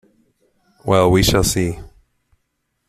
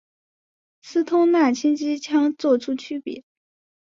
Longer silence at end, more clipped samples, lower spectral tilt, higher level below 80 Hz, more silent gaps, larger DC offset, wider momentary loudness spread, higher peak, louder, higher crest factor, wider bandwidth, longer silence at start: first, 1.05 s vs 0.75 s; neither; about the same, -4.5 dB/octave vs -4 dB/octave; first, -34 dBFS vs -72 dBFS; neither; neither; first, 16 LU vs 13 LU; first, -2 dBFS vs -6 dBFS; first, -16 LUFS vs -21 LUFS; about the same, 18 dB vs 16 dB; first, 15.5 kHz vs 7.6 kHz; about the same, 0.85 s vs 0.85 s